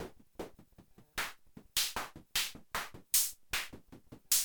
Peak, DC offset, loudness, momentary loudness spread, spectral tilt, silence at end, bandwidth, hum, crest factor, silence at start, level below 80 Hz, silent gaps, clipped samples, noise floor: -14 dBFS; under 0.1%; -35 LUFS; 19 LU; 0.5 dB/octave; 0 s; over 20 kHz; none; 24 dB; 0 s; -60 dBFS; none; under 0.1%; -61 dBFS